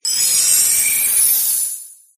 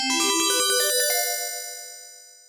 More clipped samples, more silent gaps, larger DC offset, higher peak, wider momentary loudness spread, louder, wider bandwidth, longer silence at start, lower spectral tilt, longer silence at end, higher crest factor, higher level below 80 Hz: neither; neither; neither; first, 0 dBFS vs -10 dBFS; second, 8 LU vs 17 LU; first, -12 LUFS vs -21 LUFS; second, 15.5 kHz vs 19 kHz; about the same, 0.05 s vs 0 s; second, 3.5 dB/octave vs 2 dB/octave; about the same, 0.25 s vs 0.2 s; about the same, 16 dB vs 14 dB; first, -56 dBFS vs -74 dBFS